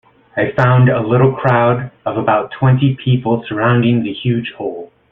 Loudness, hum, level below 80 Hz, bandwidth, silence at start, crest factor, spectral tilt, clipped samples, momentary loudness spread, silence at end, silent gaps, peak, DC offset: -15 LUFS; none; -48 dBFS; 3.9 kHz; 0.35 s; 14 dB; -10 dB/octave; under 0.1%; 10 LU; 0.25 s; none; -2 dBFS; under 0.1%